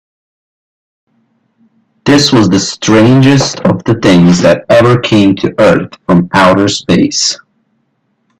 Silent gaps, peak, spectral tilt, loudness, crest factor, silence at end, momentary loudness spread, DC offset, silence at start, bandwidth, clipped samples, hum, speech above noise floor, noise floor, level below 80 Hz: none; 0 dBFS; -5 dB/octave; -8 LUFS; 10 dB; 1.05 s; 6 LU; under 0.1%; 2.05 s; 11.5 kHz; under 0.1%; none; 53 dB; -60 dBFS; -42 dBFS